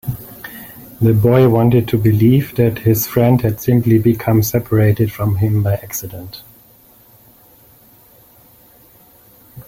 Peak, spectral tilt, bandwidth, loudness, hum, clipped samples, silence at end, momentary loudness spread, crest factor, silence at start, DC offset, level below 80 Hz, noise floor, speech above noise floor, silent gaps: -2 dBFS; -7.5 dB/octave; 16.5 kHz; -14 LUFS; none; under 0.1%; 0.05 s; 20 LU; 14 dB; 0.05 s; under 0.1%; -42 dBFS; -47 dBFS; 34 dB; none